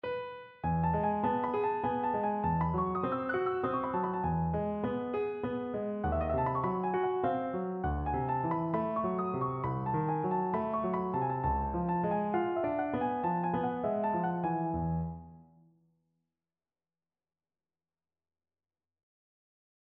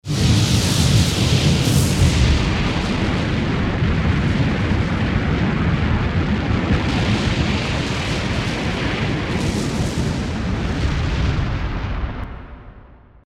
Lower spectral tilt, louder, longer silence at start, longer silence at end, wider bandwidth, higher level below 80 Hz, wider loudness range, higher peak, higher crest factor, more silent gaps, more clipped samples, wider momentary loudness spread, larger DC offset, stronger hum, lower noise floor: first, -11 dB/octave vs -5.5 dB/octave; second, -33 LUFS vs -19 LUFS; about the same, 0.05 s vs 0.05 s; first, 4.45 s vs 0.4 s; second, 4.3 kHz vs 16 kHz; second, -50 dBFS vs -26 dBFS; about the same, 4 LU vs 5 LU; second, -18 dBFS vs -4 dBFS; about the same, 16 dB vs 16 dB; neither; neither; second, 4 LU vs 7 LU; neither; neither; first, under -90 dBFS vs -44 dBFS